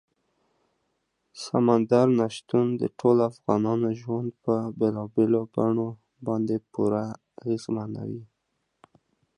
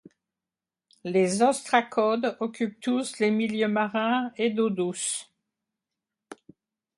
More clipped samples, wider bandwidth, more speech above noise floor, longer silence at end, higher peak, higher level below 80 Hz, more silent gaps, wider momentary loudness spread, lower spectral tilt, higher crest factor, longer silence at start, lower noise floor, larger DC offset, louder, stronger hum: neither; about the same, 11 kHz vs 11.5 kHz; second, 53 dB vs over 65 dB; first, 1.1 s vs 0.65 s; about the same, -6 dBFS vs -6 dBFS; first, -66 dBFS vs -74 dBFS; neither; first, 13 LU vs 7 LU; first, -8 dB/octave vs -4 dB/octave; about the same, 20 dB vs 22 dB; first, 1.35 s vs 1.05 s; second, -77 dBFS vs under -90 dBFS; neither; about the same, -26 LUFS vs -26 LUFS; neither